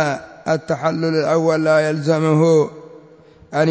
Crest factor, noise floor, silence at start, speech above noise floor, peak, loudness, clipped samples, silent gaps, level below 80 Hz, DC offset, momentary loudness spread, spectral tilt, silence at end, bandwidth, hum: 14 dB; -46 dBFS; 0 s; 29 dB; -4 dBFS; -18 LUFS; under 0.1%; none; -58 dBFS; under 0.1%; 8 LU; -6.5 dB/octave; 0 s; 8 kHz; none